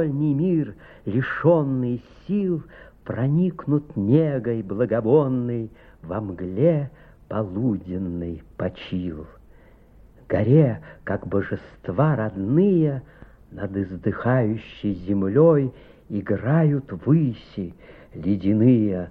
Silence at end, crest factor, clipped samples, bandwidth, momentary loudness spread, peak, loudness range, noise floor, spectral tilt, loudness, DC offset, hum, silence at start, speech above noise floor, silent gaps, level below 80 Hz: 0 s; 18 dB; under 0.1%; 4.6 kHz; 14 LU; -4 dBFS; 4 LU; -50 dBFS; -11.5 dB/octave; -23 LUFS; under 0.1%; none; 0 s; 28 dB; none; -50 dBFS